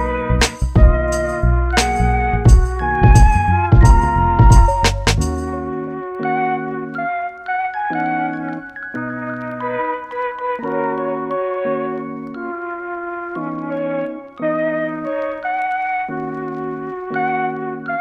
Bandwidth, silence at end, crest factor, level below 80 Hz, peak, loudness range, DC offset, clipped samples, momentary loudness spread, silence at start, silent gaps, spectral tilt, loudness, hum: 12 kHz; 0 s; 16 dB; -20 dBFS; 0 dBFS; 10 LU; under 0.1%; under 0.1%; 14 LU; 0 s; none; -6 dB/octave; -18 LUFS; none